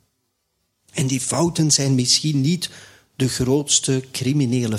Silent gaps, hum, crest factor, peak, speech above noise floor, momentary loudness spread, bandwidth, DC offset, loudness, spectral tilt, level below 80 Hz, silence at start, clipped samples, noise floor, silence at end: none; none; 18 dB; -4 dBFS; 52 dB; 9 LU; 15 kHz; under 0.1%; -19 LUFS; -4 dB/octave; -52 dBFS; 0.95 s; under 0.1%; -72 dBFS; 0 s